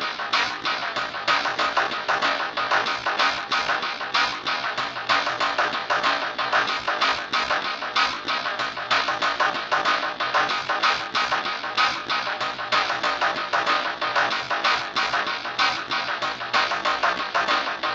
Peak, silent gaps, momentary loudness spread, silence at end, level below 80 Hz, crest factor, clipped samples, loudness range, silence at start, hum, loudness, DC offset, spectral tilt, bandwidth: -6 dBFS; none; 4 LU; 0 s; -62 dBFS; 18 dB; under 0.1%; 1 LU; 0 s; none; -23 LUFS; under 0.1%; -1.5 dB/octave; 8.2 kHz